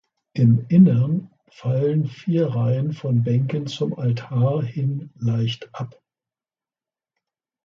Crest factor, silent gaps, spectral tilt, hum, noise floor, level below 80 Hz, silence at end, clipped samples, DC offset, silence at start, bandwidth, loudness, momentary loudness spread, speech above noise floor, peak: 18 dB; none; -9 dB/octave; none; under -90 dBFS; -58 dBFS; 1.75 s; under 0.1%; under 0.1%; 0.35 s; 7 kHz; -21 LUFS; 12 LU; over 70 dB; -4 dBFS